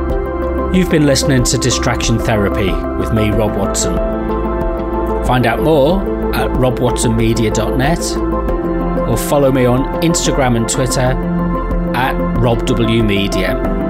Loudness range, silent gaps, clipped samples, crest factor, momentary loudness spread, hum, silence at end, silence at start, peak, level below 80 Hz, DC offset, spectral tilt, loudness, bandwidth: 1 LU; none; under 0.1%; 12 dB; 6 LU; none; 0 s; 0 s; -2 dBFS; -22 dBFS; under 0.1%; -5 dB/octave; -15 LUFS; 16 kHz